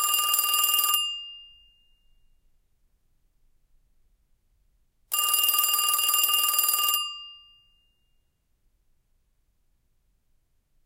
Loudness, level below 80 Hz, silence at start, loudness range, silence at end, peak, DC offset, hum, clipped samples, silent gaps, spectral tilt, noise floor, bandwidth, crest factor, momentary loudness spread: -22 LUFS; -68 dBFS; 0 s; 11 LU; 3.5 s; -6 dBFS; under 0.1%; none; under 0.1%; none; 4.5 dB/octave; -70 dBFS; 17.5 kHz; 22 dB; 11 LU